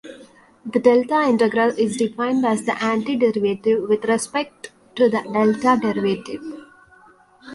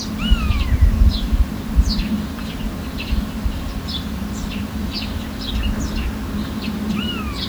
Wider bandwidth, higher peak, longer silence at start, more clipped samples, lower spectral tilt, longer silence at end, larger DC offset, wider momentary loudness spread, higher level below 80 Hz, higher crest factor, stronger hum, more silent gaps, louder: second, 11.5 kHz vs over 20 kHz; about the same, -2 dBFS vs -2 dBFS; about the same, 0.05 s vs 0 s; neither; about the same, -5 dB/octave vs -5.5 dB/octave; about the same, 0 s vs 0 s; neither; first, 15 LU vs 8 LU; second, -64 dBFS vs -22 dBFS; about the same, 18 dB vs 18 dB; neither; neither; first, -19 LUFS vs -22 LUFS